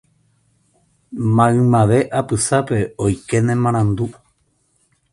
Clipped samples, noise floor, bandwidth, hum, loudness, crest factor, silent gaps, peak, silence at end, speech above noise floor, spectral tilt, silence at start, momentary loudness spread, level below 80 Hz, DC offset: under 0.1%; -63 dBFS; 11.5 kHz; none; -17 LUFS; 18 dB; none; 0 dBFS; 1 s; 47 dB; -6.5 dB/octave; 1.1 s; 10 LU; -44 dBFS; under 0.1%